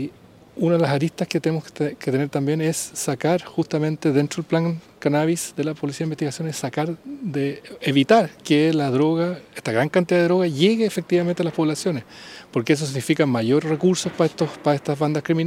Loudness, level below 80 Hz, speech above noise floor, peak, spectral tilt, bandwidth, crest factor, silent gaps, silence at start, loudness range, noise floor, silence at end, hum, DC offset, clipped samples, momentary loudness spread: -22 LUFS; -64 dBFS; 25 dB; -2 dBFS; -5.5 dB/octave; 16 kHz; 20 dB; none; 0 s; 4 LU; -46 dBFS; 0 s; none; under 0.1%; under 0.1%; 8 LU